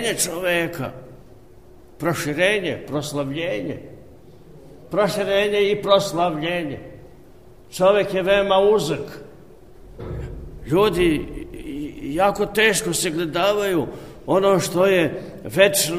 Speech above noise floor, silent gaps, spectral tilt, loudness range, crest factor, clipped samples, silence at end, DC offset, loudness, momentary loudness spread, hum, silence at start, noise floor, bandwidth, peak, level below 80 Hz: 27 dB; none; -4 dB/octave; 5 LU; 20 dB; under 0.1%; 0 s; 0.4%; -20 LUFS; 16 LU; none; 0 s; -47 dBFS; 15.5 kHz; -2 dBFS; -44 dBFS